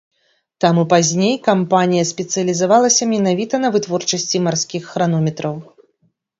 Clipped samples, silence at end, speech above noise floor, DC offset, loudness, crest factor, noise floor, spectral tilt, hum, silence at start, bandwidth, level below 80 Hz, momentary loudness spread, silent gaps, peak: under 0.1%; 0.75 s; 48 dB; under 0.1%; -16 LUFS; 16 dB; -64 dBFS; -4.5 dB/octave; none; 0.6 s; 7.8 kHz; -62 dBFS; 7 LU; none; 0 dBFS